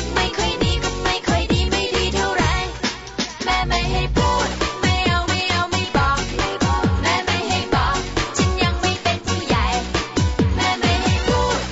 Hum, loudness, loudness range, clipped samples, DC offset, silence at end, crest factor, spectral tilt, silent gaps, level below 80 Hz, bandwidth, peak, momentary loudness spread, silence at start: none; -20 LUFS; 1 LU; under 0.1%; under 0.1%; 0 s; 14 dB; -4.5 dB/octave; none; -28 dBFS; 8 kHz; -6 dBFS; 3 LU; 0 s